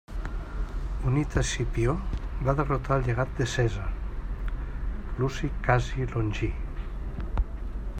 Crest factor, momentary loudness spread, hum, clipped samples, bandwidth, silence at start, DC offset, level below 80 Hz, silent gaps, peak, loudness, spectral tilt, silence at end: 20 dB; 11 LU; none; under 0.1%; 9.8 kHz; 0.1 s; under 0.1%; -32 dBFS; none; -8 dBFS; -30 LUFS; -6 dB/octave; 0 s